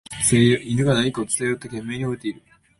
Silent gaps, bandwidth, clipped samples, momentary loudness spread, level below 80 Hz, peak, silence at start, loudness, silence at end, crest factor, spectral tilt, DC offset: none; 12 kHz; under 0.1%; 13 LU; -50 dBFS; -4 dBFS; 0.1 s; -21 LUFS; 0.45 s; 18 dB; -4.5 dB/octave; under 0.1%